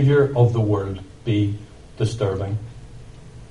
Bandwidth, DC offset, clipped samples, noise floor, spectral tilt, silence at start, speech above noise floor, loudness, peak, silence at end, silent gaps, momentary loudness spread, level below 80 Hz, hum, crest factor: 10.5 kHz; 0.3%; under 0.1%; -40 dBFS; -8 dB/octave; 0 s; 21 dB; -22 LUFS; -4 dBFS; 0.05 s; none; 25 LU; -44 dBFS; none; 18 dB